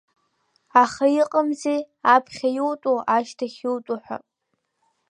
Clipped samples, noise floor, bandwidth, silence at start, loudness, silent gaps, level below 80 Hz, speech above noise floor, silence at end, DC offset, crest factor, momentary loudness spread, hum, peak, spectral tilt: under 0.1%; -76 dBFS; 11 kHz; 0.75 s; -22 LUFS; none; -72 dBFS; 54 dB; 0.9 s; under 0.1%; 22 dB; 12 LU; none; -2 dBFS; -4 dB/octave